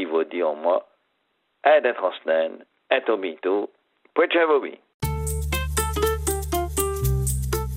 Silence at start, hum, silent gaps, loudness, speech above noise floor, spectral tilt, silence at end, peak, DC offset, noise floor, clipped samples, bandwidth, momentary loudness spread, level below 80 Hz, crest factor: 0 s; none; 4.94-5.00 s; -23 LUFS; 50 dB; -4.5 dB/octave; 0 s; -4 dBFS; under 0.1%; -72 dBFS; under 0.1%; 16 kHz; 9 LU; -34 dBFS; 20 dB